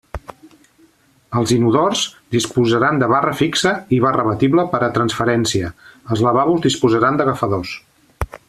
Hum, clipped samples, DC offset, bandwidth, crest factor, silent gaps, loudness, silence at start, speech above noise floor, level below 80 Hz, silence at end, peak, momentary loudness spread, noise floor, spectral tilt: none; under 0.1%; under 0.1%; 14 kHz; 16 dB; none; -17 LUFS; 0.15 s; 38 dB; -42 dBFS; 0.15 s; 0 dBFS; 9 LU; -54 dBFS; -5 dB/octave